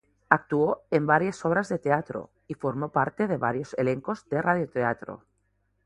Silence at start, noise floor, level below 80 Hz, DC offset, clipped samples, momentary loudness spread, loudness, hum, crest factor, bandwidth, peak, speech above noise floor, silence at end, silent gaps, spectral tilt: 0.3 s; -72 dBFS; -64 dBFS; under 0.1%; under 0.1%; 12 LU; -26 LUFS; none; 26 dB; 11 kHz; 0 dBFS; 46 dB; 0.7 s; none; -7.5 dB/octave